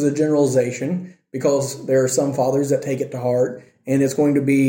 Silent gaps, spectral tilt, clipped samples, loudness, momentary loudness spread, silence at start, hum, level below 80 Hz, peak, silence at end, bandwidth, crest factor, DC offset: none; -6 dB/octave; under 0.1%; -20 LUFS; 8 LU; 0 s; none; -64 dBFS; -6 dBFS; 0 s; 17 kHz; 14 dB; under 0.1%